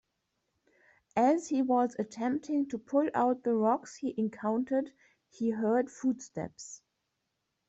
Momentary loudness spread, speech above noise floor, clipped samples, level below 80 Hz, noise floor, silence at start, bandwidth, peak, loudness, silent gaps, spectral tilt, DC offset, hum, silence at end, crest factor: 13 LU; 52 dB; under 0.1%; -74 dBFS; -83 dBFS; 1.15 s; 8.2 kHz; -16 dBFS; -31 LUFS; none; -6 dB/octave; under 0.1%; none; 0.9 s; 16 dB